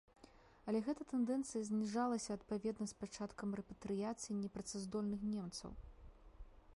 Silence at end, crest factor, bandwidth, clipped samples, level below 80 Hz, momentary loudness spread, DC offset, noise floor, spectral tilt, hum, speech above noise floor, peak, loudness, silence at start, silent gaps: 0 s; 16 dB; 11.5 kHz; under 0.1%; -64 dBFS; 9 LU; under 0.1%; -65 dBFS; -5.5 dB/octave; none; 23 dB; -28 dBFS; -43 LUFS; 0.2 s; none